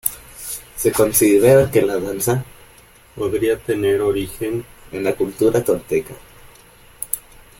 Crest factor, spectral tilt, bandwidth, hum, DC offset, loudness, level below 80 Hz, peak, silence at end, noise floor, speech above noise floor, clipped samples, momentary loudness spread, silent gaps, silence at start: 20 dB; -5 dB/octave; 17 kHz; none; under 0.1%; -18 LUFS; -46 dBFS; 0 dBFS; 0.4 s; -47 dBFS; 30 dB; under 0.1%; 16 LU; none; 0.05 s